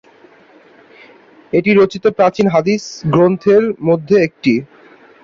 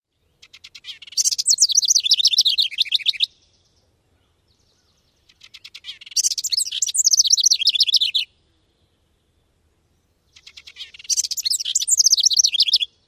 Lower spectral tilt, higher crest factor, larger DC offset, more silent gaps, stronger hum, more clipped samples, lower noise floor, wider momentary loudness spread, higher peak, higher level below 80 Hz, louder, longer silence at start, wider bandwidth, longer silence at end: first, -7 dB/octave vs 6 dB/octave; about the same, 14 dB vs 18 dB; neither; neither; neither; neither; second, -46 dBFS vs -65 dBFS; second, 6 LU vs 23 LU; about the same, -2 dBFS vs -4 dBFS; first, -54 dBFS vs -68 dBFS; about the same, -14 LUFS vs -16 LUFS; first, 1.55 s vs 0.75 s; second, 7.4 kHz vs 16 kHz; first, 0.6 s vs 0.2 s